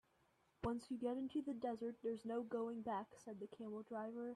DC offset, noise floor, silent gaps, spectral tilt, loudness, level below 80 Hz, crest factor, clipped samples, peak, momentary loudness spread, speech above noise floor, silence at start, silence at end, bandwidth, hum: under 0.1%; -79 dBFS; none; -7 dB/octave; -47 LUFS; -72 dBFS; 16 dB; under 0.1%; -30 dBFS; 8 LU; 33 dB; 0.6 s; 0 s; 12 kHz; none